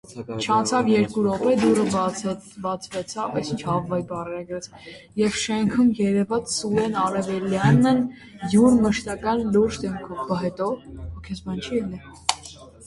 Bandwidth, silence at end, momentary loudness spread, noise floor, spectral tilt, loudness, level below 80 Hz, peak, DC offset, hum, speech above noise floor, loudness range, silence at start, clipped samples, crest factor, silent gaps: 11.5 kHz; 0 s; 15 LU; -43 dBFS; -5.5 dB/octave; -23 LUFS; -48 dBFS; 0 dBFS; under 0.1%; none; 21 dB; 6 LU; 0.1 s; under 0.1%; 22 dB; none